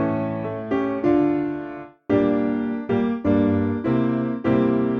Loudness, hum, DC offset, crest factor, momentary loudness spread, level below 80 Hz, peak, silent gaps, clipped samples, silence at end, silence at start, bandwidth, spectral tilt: -22 LUFS; none; under 0.1%; 14 dB; 8 LU; -50 dBFS; -6 dBFS; none; under 0.1%; 0 s; 0 s; 5.2 kHz; -10 dB/octave